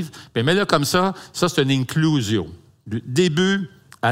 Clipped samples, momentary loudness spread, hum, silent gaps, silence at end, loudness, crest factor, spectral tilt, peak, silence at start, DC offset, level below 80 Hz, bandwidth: under 0.1%; 11 LU; none; none; 0 s; -20 LUFS; 18 dB; -5 dB/octave; -2 dBFS; 0 s; under 0.1%; -56 dBFS; 16 kHz